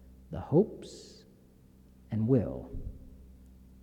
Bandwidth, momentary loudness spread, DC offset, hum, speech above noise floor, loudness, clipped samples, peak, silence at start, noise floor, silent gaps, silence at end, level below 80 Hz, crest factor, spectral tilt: 11 kHz; 21 LU; under 0.1%; none; 28 dB; -31 LUFS; under 0.1%; -14 dBFS; 0.05 s; -58 dBFS; none; 0.4 s; -50 dBFS; 20 dB; -9 dB/octave